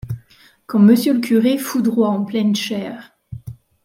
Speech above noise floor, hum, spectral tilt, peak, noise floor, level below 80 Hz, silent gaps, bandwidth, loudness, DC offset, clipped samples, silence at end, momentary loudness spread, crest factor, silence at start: 35 dB; none; -6 dB/octave; -2 dBFS; -51 dBFS; -52 dBFS; none; 16.5 kHz; -17 LUFS; under 0.1%; under 0.1%; 0.35 s; 23 LU; 16 dB; 0.05 s